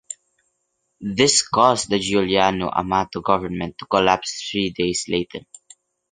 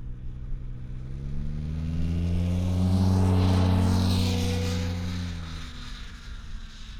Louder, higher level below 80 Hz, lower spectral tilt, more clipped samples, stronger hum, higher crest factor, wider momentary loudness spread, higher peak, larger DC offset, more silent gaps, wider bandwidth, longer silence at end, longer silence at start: first, -20 LUFS vs -26 LUFS; second, -50 dBFS vs -36 dBFS; second, -3 dB/octave vs -6.5 dB/octave; neither; neither; first, 20 dB vs 14 dB; second, 14 LU vs 19 LU; first, 0 dBFS vs -12 dBFS; neither; neither; second, 10 kHz vs 14 kHz; first, 0.7 s vs 0 s; about the same, 0.1 s vs 0 s